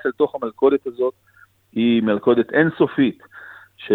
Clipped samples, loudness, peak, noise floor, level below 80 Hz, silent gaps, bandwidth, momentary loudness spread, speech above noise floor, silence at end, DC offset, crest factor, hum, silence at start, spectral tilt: under 0.1%; -19 LUFS; -2 dBFS; -42 dBFS; -62 dBFS; none; 4.2 kHz; 20 LU; 24 dB; 0 s; under 0.1%; 18 dB; none; 0.05 s; -9 dB/octave